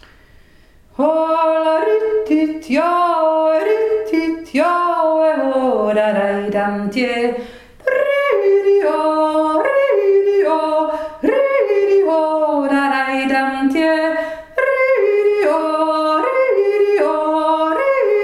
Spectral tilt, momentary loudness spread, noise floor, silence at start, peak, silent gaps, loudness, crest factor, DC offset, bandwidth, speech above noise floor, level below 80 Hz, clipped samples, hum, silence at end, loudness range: -5.5 dB/octave; 5 LU; -47 dBFS; 1 s; -4 dBFS; none; -16 LUFS; 12 dB; under 0.1%; 12 kHz; 31 dB; -54 dBFS; under 0.1%; none; 0 s; 2 LU